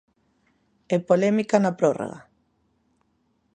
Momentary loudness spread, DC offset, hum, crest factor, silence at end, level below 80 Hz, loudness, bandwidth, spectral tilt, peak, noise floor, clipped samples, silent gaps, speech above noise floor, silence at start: 13 LU; under 0.1%; none; 22 dB; 1.35 s; -70 dBFS; -23 LUFS; 9.6 kHz; -7 dB/octave; -4 dBFS; -69 dBFS; under 0.1%; none; 47 dB; 0.9 s